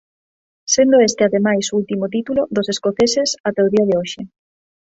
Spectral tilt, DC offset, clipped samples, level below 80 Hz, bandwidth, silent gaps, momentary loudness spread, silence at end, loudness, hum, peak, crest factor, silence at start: -4 dB/octave; under 0.1%; under 0.1%; -56 dBFS; 8 kHz; 3.40-3.44 s; 9 LU; 0.7 s; -16 LUFS; none; -2 dBFS; 16 dB; 0.65 s